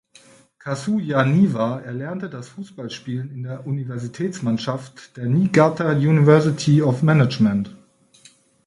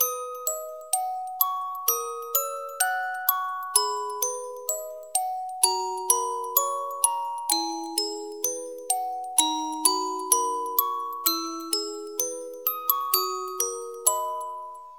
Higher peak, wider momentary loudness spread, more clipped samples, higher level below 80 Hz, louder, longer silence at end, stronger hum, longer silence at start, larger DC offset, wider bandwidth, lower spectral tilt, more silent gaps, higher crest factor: about the same, 0 dBFS vs -2 dBFS; first, 16 LU vs 7 LU; neither; first, -58 dBFS vs -86 dBFS; first, -20 LUFS vs -26 LUFS; first, 0.9 s vs 0 s; neither; first, 0.65 s vs 0 s; second, under 0.1% vs 0.1%; second, 11 kHz vs 18 kHz; first, -7.5 dB/octave vs 2.5 dB/octave; neither; second, 20 dB vs 26 dB